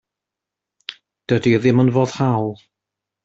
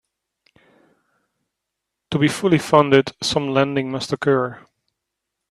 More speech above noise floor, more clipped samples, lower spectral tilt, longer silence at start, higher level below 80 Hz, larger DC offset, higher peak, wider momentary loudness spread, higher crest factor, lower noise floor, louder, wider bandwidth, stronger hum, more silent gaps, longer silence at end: first, 69 dB vs 63 dB; neither; first, -7.5 dB/octave vs -5.5 dB/octave; second, 0.9 s vs 2.1 s; about the same, -56 dBFS vs -56 dBFS; neither; second, -4 dBFS vs 0 dBFS; first, 20 LU vs 10 LU; about the same, 18 dB vs 22 dB; first, -85 dBFS vs -81 dBFS; about the same, -18 LUFS vs -19 LUFS; second, 7.8 kHz vs 14 kHz; neither; neither; second, 0.7 s vs 0.9 s